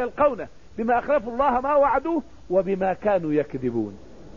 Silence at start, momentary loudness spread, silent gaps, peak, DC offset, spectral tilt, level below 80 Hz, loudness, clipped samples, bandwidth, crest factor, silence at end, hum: 0 s; 10 LU; none; -8 dBFS; 0.6%; -8.5 dB/octave; -48 dBFS; -23 LUFS; under 0.1%; 7 kHz; 14 dB; 0 s; none